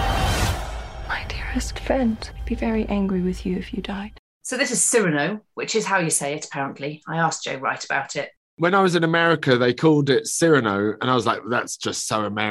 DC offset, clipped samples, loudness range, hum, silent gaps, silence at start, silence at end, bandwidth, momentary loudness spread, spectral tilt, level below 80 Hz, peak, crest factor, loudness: under 0.1%; under 0.1%; 6 LU; none; 4.19-4.41 s, 8.37-8.57 s; 0 s; 0 s; 16 kHz; 12 LU; -4 dB/octave; -36 dBFS; -4 dBFS; 18 dB; -22 LUFS